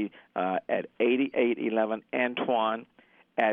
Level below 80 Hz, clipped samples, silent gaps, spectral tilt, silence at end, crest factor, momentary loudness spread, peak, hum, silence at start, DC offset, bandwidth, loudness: -78 dBFS; under 0.1%; none; -8 dB/octave; 0 s; 20 dB; 7 LU; -10 dBFS; none; 0 s; under 0.1%; 3.8 kHz; -29 LUFS